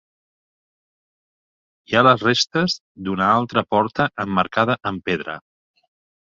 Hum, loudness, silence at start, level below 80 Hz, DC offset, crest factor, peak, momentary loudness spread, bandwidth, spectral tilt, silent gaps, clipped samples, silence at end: none; -19 LUFS; 1.9 s; -56 dBFS; under 0.1%; 20 dB; -2 dBFS; 11 LU; 7.8 kHz; -5 dB/octave; 2.81-2.95 s; under 0.1%; 0.9 s